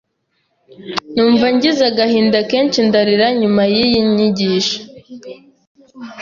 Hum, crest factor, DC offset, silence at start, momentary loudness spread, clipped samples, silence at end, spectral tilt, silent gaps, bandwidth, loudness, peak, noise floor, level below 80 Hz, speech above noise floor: none; 14 dB; under 0.1%; 0.8 s; 22 LU; under 0.1%; 0 s; -5 dB/octave; 5.67-5.75 s; 7.4 kHz; -14 LUFS; -2 dBFS; -66 dBFS; -52 dBFS; 53 dB